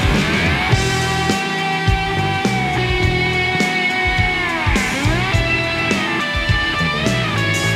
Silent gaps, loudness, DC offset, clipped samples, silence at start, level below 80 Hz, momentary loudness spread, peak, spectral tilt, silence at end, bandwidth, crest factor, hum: none; -17 LUFS; under 0.1%; under 0.1%; 0 s; -28 dBFS; 2 LU; -2 dBFS; -4.5 dB/octave; 0 s; 15.5 kHz; 16 dB; none